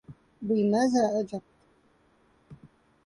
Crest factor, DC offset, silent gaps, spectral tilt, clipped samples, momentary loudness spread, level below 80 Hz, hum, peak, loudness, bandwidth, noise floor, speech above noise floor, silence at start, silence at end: 16 dB; under 0.1%; none; -6 dB/octave; under 0.1%; 15 LU; -68 dBFS; none; -14 dBFS; -27 LUFS; 11 kHz; -65 dBFS; 39 dB; 0.1 s; 0.5 s